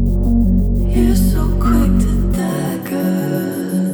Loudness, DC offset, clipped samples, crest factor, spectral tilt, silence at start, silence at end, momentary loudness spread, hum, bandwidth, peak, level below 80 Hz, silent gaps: -16 LUFS; under 0.1%; under 0.1%; 12 dB; -7.5 dB/octave; 0 s; 0 s; 6 LU; none; over 20 kHz; -2 dBFS; -18 dBFS; none